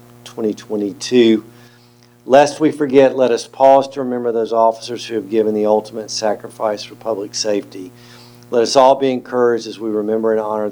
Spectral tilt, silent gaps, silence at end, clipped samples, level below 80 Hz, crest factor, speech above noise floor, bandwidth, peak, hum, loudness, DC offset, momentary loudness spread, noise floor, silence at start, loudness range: -4.5 dB/octave; none; 0 s; under 0.1%; -64 dBFS; 16 dB; 32 dB; over 20 kHz; 0 dBFS; 60 Hz at -50 dBFS; -16 LUFS; under 0.1%; 12 LU; -48 dBFS; 0.25 s; 6 LU